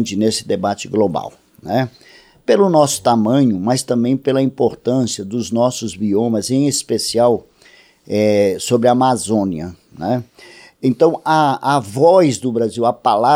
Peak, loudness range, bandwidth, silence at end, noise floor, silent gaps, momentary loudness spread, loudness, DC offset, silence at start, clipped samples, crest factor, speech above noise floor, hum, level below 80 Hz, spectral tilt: 0 dBFS; 2 LU; 16 kHz; 0 s; -48 dBFS; none; 9 LU; -16 LUFS; under 0.1%; 0 s; under 0.1%; 16 dB; 33 dB; none; -56 dBFS; -5.5 dB/octave